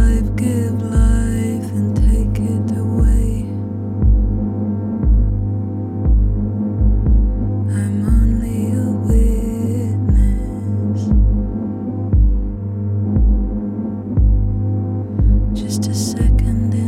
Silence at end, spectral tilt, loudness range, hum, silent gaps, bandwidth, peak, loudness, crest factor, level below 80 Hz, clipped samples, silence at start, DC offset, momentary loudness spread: 0 s; -8 dB/octave; 1 LU; none; none; 11.5 kHz; -2 dBFS; -18 LUFS; 12 dB; -18 dBFS; under 0.1%; 0 s; under 0.1%; 6 LU